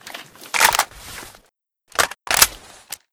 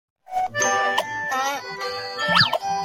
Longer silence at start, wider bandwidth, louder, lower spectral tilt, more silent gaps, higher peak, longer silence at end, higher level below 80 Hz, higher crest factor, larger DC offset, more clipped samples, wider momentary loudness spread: second, 0.05 s vs 0.3 s; first, over 20 kHz vs 16.5 kHz; first, -18 LUFS vs -22 LUFS; second, 1 dB/octave vs -1.5 dB/octave; neither; first, 0 dBFS vs -4 dBFS; first, 0.55 s vs 0 s; first, -48 dBFS vs -60 dBFS; about the same, 22 dB vs 18 dB; neither; neither; first, 21 LU vs 11 LU